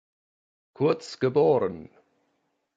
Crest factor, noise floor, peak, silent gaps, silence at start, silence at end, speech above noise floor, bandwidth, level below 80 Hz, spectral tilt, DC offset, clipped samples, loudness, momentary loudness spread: 18 dB; -74 dBFS; -10 dBFS; none; 0.8 s; 0.95 s; 50 dB; 8 kHz; -64 dBFS; -7 dB/octave; under 0.1%; under 0.1%; -25 LUFS; 10 LU